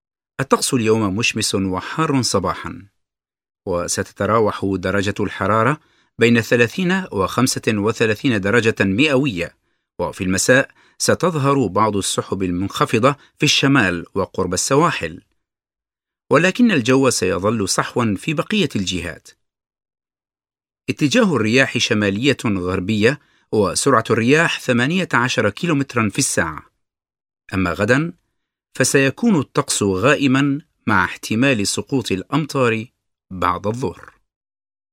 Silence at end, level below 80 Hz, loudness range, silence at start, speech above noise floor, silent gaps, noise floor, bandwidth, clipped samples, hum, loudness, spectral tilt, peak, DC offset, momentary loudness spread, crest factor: 1 s; -52 dBFS; 4 LU; 0.4 s; over 72 dB; none; under -90 dBFS; 16.5 kHz; under 0.1%; none; -18 LUFS; -4.5 dB/octave; 0 dBFS; under 0.1%; 9 LU; 18 dB